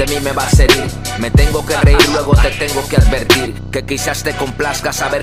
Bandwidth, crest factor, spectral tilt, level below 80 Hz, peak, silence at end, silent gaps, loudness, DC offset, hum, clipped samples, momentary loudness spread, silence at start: 15.5 kHz; 12 dB; -4.5 dB/octave; -18 dBFS; 0 dBFS; 0 s; none; -13 LUFS; under 0.1%; none; under 0.1%; 9 LU; 0 s